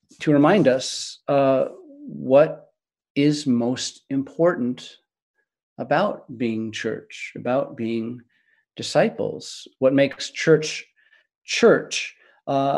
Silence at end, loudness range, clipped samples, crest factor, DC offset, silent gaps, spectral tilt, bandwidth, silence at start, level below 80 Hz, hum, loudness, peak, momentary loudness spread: 0 s; 5 LU; under 0.1%; 20 dB; under 0.1%; 3.10-3.15 s, 5.22-5.34 s, 5.63-5.76 s, 11.35-11.41 s; -5 dB/octave; 11.5 kHz; 0.2 s; -70 dBFS; none; -22 LUFS; -4 dBFS; 16 LU